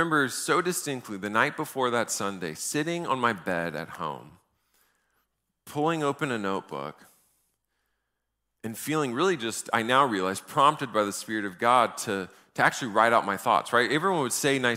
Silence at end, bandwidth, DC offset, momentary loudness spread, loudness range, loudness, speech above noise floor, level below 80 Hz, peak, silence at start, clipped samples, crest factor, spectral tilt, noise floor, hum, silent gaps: 0 s; 16 kHz; under 0.1%; 12 LU; 8 LU; -26 LUFS; 54 dB; -72 dBFS; -6 dBFS; 0 s; under 0.1%; 22 dB; -3.5 dB/octave; -81 dBFS; none; none